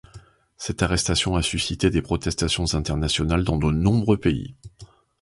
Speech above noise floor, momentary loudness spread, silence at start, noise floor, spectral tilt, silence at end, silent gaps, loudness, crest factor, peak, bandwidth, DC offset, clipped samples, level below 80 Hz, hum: 26 dB; 5 LU; 0.15 s; -48 dBFS; -5 dB/octave; 0.35 s; none; -22 LUFS; 18 dB; -6 dBFS; 11.5 kHz; under 0.1%; under 0.1%; -34 dBFS; none